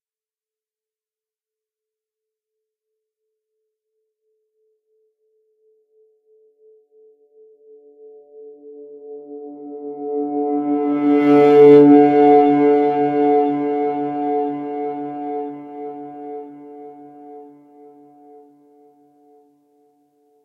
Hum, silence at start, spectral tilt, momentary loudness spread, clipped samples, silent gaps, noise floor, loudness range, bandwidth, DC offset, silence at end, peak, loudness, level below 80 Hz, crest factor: none; 8.4 s; -9 dB/octave; 26 LU; under 0.1%; none; under -90 dBFS; 23 LU; 4.6 kHz; under 0.1%; 3 s; 0 dBFS; -15 LUFS; -76 dBFS; 20 dB